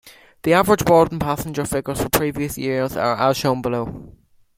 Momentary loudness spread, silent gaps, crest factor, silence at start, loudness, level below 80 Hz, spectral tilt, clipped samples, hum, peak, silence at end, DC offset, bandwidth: 10 LU; none; 20 dB; 0.05 s; -19 LUFS; -44 dBFS; -5 dB/octave; under 0.1%; none; 0 dBFS; 0.5 s; under 0.1%; 16.5 kHz